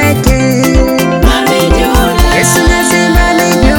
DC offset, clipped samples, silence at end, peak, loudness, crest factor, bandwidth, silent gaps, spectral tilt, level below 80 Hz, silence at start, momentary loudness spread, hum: under 0.1%; 1%; 0 s; 0 dBFS; -8 LUFS; 8 dB; 18.5 kHz; none; -4.5 dB/octave; -14 dBFS; 0 s; 2 LU; none